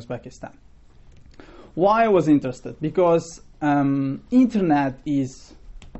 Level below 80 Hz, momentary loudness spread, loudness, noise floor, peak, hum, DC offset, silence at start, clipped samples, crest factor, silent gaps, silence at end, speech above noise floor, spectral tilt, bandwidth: -48 dBFS; 17 LU; -21 LUFS; -48 dBFS; -6 dBFS; none; 0.2%; 0 s; under 0.1%; 16 dB; none; 0 s; 28 dB; -7.5 dB/octave; 8.2 kHz